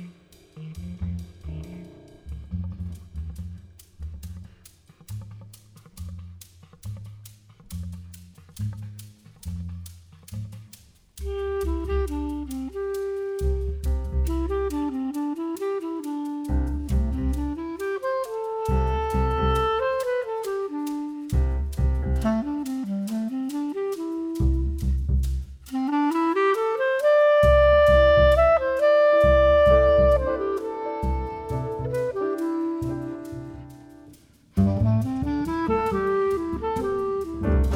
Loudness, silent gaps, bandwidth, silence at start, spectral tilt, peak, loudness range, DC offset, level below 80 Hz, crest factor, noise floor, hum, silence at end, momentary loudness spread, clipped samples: -24 LUFS; none; 15 kHz; 0 s; -7.5 dB/octave; -6 dBFS; 21 LU; under 0.1%; -32 dBFS; 18 dB; -52 dBFS; none; 0 s; 23 LU; under 0.1%